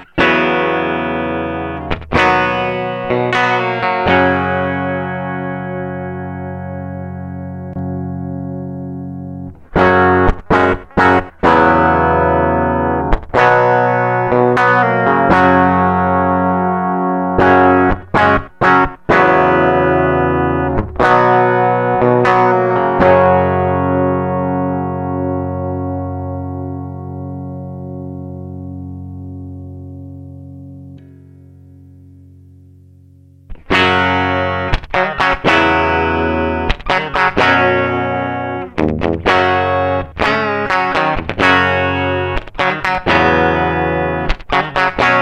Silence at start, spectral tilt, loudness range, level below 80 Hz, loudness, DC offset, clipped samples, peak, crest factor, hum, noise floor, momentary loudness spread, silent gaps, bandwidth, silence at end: 0 s; -7 dB/octave; 13 LU; -32 dBFS; -14 LUFS; under 0.1%; under 0.1%; 0 dBFS; 14 dB; none; -44 dBFS; 16 LU; none; 9.6 kHz; 0 s